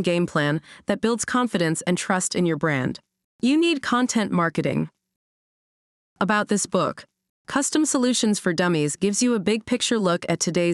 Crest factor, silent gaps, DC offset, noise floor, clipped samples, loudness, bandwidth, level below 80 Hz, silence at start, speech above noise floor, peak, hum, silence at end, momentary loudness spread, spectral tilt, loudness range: 16 dB; 3.24-3.39 s, 5.16-6.16 s, 7.29-7.45 s; under 0.1%; under -90 dBFS; under 0.1%; -22 LUFS; 13 kHz; -62 dBFS; 0 s; over 68 dB; -6 dBFS; none; 0 s; 7 LU; -4 dB/octave; 3 LU